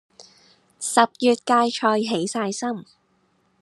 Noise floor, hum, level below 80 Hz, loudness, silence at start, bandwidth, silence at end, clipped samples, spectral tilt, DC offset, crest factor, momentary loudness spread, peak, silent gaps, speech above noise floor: -65 dBFS; none; -78 dBFS; -21 LUFS; 0.2 s; 12.5 kHz; 0.8 s; under 0.1%; -3.5 dB/octave; under 0.1%; 22 dB; 11 LU; -2 dBFS; none; 44 dB